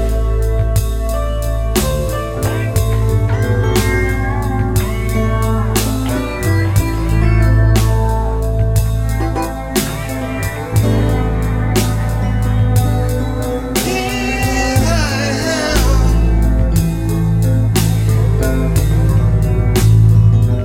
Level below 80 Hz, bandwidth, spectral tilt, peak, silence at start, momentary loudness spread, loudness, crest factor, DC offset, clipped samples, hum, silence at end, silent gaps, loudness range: -18 dBFS; 17 kHz; -6 dB/octave; 0 dBFS; 0 s; 6 LU; -15 LUFS; 14 dB; 0.3%; under 0.1%; none; 0 s; none; 3 LU